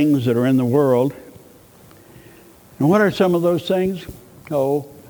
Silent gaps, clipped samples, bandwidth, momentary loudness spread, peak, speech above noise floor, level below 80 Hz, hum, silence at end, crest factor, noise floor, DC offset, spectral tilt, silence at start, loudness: none; under 0.1%; over 20 kHz; 9 LU; -4 dBFS; 29 dB; -54 dBFS; none; 0.15 s; 16 dB; -47 dBFS; under 0.1%; -7.5 dB/octave; 0 s; -18 LUFS